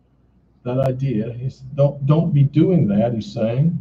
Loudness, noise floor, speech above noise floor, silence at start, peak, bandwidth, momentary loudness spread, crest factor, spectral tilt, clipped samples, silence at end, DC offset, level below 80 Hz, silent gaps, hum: -19 LUFS; -57 dBFS; 39 dB; 0.65 s; -2 dBFS; 7 kHz; 12 LU; 16 dB; -10 dB/octave; under 0.1%; 0 s; under 0.1%; -48 dBFS; none; none